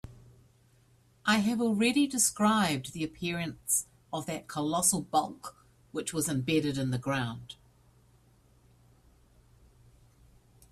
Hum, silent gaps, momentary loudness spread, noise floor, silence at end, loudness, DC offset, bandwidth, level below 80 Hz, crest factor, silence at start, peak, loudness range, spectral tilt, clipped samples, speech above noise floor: none; none; 15 LU; -64 dBFS; 3.2 s; -29 LUFS; under 0.1%; 15.5 kHz; -62 dBFS; 20 dB; 0.05 s; -12 dBFS; 7 LU; -3.5 dB/octave; under 0.1%; 34 dB